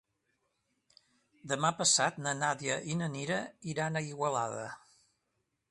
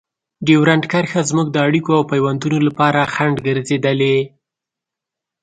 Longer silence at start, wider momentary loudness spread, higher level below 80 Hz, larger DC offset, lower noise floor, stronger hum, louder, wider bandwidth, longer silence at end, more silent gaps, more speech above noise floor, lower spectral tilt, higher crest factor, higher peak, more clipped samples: first, 1.45 s vs 0.4 s; first, 12 LU vs 5 LU; second, -74 dBFS vs -54 dBFS; neither; about the same, -82 dBFS vs -84 dBFS; neither; second, -32 LUFS vs -16 LUFS; first, 11.5 kHz vs 9.4 kHz; second, 0.95 s vs 1.15 s; neither; second, 49 dB vs 69 dB; second, -3 dB/octave vs -6 dB/octave; first, 22 dB vs 16 dB; second, -14 dBFS vs 0 dBFS; neither